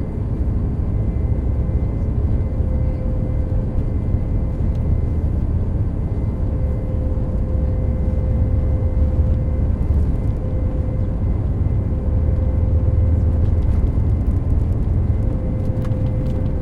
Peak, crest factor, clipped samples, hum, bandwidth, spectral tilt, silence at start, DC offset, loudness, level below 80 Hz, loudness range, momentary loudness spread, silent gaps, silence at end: -6 dBFS; 12 dB; under 0.1%; none; 3.2 kHz; -11 dB/octave; 0 s; under 0.1%; -21 LUFS; -22 dBFS; 3 LU; 4 LU; none; 0 s